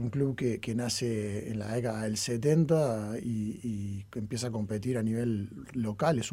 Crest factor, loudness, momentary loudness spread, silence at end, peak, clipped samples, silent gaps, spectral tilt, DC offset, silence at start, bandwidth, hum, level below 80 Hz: 18 dB; -32 LUFS; 9 LU; 0 s; -14 dBFS; under 0.1%; none; -6 dB/octave; under 0.1%; 0 s; 16 kHz; none; -60 dBFS